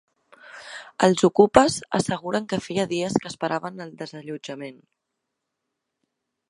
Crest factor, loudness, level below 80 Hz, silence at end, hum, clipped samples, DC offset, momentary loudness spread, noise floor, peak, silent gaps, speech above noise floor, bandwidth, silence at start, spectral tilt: 24 dB; -22 LUFS; -56 dBFS; 1.75 s; none; under 0.1%; under 0.1%; 21 LU; -81 dBFS; 0 dBFS; none; 58 dB; 11.5 kHz; 0.45 s; -5 dB/octave